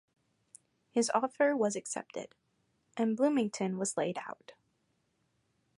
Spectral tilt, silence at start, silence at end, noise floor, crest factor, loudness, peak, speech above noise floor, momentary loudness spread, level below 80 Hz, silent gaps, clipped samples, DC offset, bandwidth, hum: -4.5 dB/octave; 0.95 s; 1.25 s; -77 dBFS; 20 dB; -32 LUFS; -14 dBFS; 45 dB; 17 LU; -82 dBFS; none; under 0.1%; under 0.1%; 11.5 kHz; none